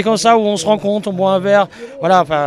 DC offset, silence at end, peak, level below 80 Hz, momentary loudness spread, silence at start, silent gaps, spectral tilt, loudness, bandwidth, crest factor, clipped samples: under 0.1%; 0 s; 0 dBFS; -54 dBFS; 7 LU; 0 s; none; -4.5 dB/octave; -14 LUFS; 13.5 kHz; 14 dB; under 0.1%